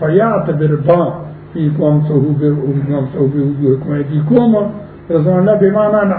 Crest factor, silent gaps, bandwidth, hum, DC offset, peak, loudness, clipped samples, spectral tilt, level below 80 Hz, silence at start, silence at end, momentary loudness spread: 12 dB; none; 4.1 kHz; none; under 0.1%; 0 dBFS; -13 LUFS; under 0.1%; -13.5 dB/octave; -46 dBFS; 0 s; 0 s; 7 LU